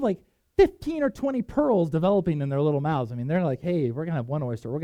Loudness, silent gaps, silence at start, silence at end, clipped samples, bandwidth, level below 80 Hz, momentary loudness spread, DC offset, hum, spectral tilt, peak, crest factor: -25 LUFS; none; 0 s; 0 s; under 0.1%; 10.5 kHz; -48 dBFS; 8 LU; under 0.1%; none; -9 dB/octave; -6 dBFS; 18 dB